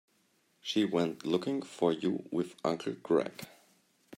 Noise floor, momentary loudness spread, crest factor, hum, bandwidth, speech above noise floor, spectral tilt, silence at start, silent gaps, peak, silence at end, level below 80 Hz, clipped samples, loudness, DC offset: -72 dBFS; 11 LU; 18 dB; none; 16 kHz; 40 dB; -6 dB/octave; 0.65 s; none; -14 dBFS; 0 s; -80 dBFS; under 0.1%; -33 LUFS; under 0.1%